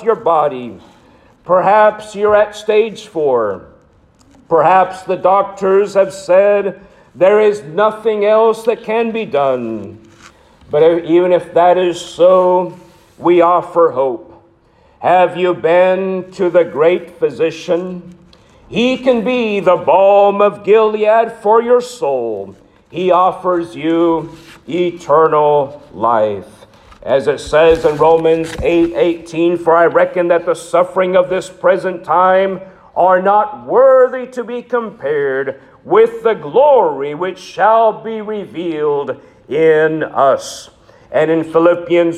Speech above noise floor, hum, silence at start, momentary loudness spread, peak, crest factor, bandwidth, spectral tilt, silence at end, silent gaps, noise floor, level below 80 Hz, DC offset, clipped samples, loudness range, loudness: 37 dB; none; 0 s; 12 LU; 0 dBFS; 12 dB; 11.5 kHz; -6 dB/octave; 0 s; none; -50 dBFS; -48 dBFS; under 0.1%; under 0.1%; 3 LU; -13 LUFS